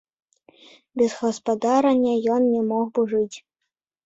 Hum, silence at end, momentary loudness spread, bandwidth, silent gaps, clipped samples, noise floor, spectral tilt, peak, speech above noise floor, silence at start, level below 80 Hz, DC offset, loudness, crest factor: none; 0.65 s; 8 LU; 8 kHz; none; under 0.1%; -82 dBFS; -5.5 dB/octave; -6 dBFS; 61 dB; 0.95 s; -66 dBFS; under 0.1%; -22 LUFS; 16 dB